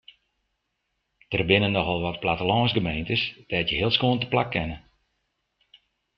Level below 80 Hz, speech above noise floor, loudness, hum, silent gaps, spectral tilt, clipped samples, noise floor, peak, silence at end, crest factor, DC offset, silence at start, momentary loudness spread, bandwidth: -50 dBFS; 53 dB; -24 LUFS; none; none; -8 dB/octave; under 0.1%; -78 dBFS; -4 dBFS; 1.4 s; 22 dB; under 0.1%; 1.3 s; 7 LU; 6 kHz